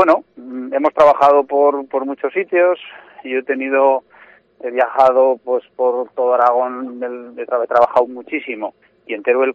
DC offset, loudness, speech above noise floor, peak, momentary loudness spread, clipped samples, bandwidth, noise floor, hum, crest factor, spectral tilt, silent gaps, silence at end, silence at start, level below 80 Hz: under 0.1%; -16 LUFS; 31 dB; -2 dBFS; 15 LU; under 0.1%; 7.2 kHz; -47 dBFS; none; 14 dB; -5.5 dB/octave; none; 0 s; 0 s; -62 dBFS